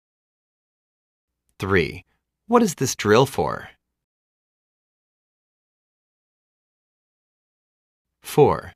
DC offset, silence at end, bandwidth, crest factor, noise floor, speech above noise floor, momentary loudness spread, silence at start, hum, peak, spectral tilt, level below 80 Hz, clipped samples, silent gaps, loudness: under 0.1%; 0.05 s; 15.5 kHz; 22 dB; under -90 dBFS; over 70 dB; 15 LU; 1.6 s; none; -2 dBFS; -5 dB/octave; -54 dBFS; under 0.1%; 4.04-8.05 s; -20 LUFS